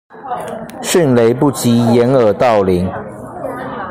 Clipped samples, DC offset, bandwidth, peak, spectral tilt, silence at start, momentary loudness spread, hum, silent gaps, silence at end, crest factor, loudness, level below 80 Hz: under 0.1%; under 0.1%; 15.5 kHz; 0 dBFS; -6 dB/octave; 0.15 s; 15 LU; none; none; 0 s; 14 dB; -13 LUFS; -46 dBFS